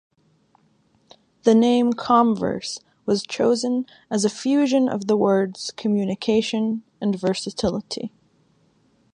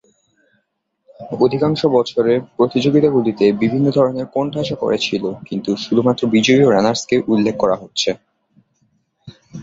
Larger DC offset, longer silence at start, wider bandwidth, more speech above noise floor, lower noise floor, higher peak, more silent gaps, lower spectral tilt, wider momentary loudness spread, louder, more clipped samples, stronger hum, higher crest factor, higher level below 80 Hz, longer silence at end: neither; first, 1.45 s vs 1.2 s; first, 10.5 kHz vs 8 kHz; second, 41 dB vs 54 dB; second, -62 dBFS vs -69 dBFS; about the same, -2 dBFS vs -2 dBFS; neither; about the same, -5.5 dB/octave vs -5.5 dB/octave; about the same, 10 LU vs 8 LU; second, -22 LUFS vs -16 LUFS; neither; neither; about the same, 20 dB vs 16 dB; about the same, -56 dBFS vs -54 dBFS; first, 1.05 s vs 0 s